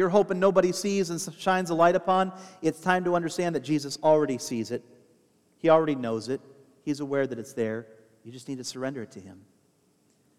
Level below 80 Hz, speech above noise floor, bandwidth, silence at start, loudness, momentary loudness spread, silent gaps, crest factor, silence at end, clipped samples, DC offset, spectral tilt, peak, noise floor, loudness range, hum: -68 dBFS; 40 dB; 15.5 kHz; 0 s; -26 LUFS; 15 LU; none; 20 dB; 1.05 s; under 0.1%; under 0.1%; -5 dB/octave; -6 dBFS; -66 dBFS; 9 LU; none